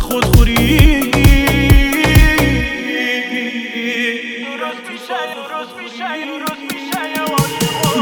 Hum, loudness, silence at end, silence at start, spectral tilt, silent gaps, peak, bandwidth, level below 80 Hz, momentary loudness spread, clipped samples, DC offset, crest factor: none; -15 LUFS; 0 s; 0 s; -5 dB/octave; none; 0 dBFS; over 20 kHz; -18 dBFS; 13 LU; under 0.1%; under 0.1%; 14 dB